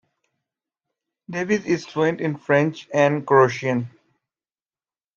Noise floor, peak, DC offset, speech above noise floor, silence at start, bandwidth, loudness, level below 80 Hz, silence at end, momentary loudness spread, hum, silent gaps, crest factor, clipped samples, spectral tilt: under -90 dBFS; -4 dBFS; under 0.1%; over 70 dB; 1.3 s; 7.2 kHz; -21 LUFS; -68 dBFS; 1.25 s; 11 LU; none; none; 20 dB; under 0.1%; -6.5 dB/octave